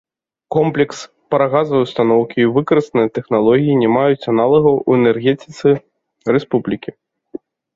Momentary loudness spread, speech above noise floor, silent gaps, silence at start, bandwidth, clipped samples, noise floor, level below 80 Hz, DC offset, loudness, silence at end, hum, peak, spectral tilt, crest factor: 13 LU; 21 dB; none; 0.5 s; 7.8 kHz; under 0.1%; -35 dBFS; -56 dBFS; under 0.1%; -15 LUFS; 0.4 s; none; -2 dBFS; -7.5 dB/octave; 14 dB